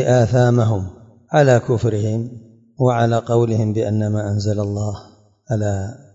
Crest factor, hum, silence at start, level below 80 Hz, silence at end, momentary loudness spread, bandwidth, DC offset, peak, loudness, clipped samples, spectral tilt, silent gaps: 16 dB; none; 0 s; -52 dBFS; 0.2 s; 11 LU; 7.8 kHz; under 0.1%; -2 dBFS; -18 LUFS; under 0.1%; -7.5 dB/octave; none